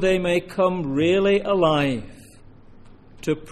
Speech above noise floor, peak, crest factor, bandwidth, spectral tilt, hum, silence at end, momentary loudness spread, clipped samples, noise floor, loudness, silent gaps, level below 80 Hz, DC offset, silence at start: 26 dB; -6 dBFS; 16 dB; 13.5 kHz; -6 dB/octave; none; 0 s; 9 LU; under 0.1%; -46 dBFS; -21 LUFS; none; -44 dBFS; under 0.1%; 0 s